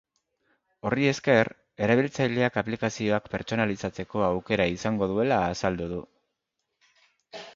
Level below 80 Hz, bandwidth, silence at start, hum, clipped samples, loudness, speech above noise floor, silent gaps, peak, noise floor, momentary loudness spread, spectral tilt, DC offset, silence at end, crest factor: -54 dBFS; 7.8 kHz; 0.85 s; none; under 0.1%; -26 LUFS; 56 dB; none; -6 dBFS; -81 dBFS; 10 LU; -6 dB/octave; under 0.1%; 0.05 s; 22 dB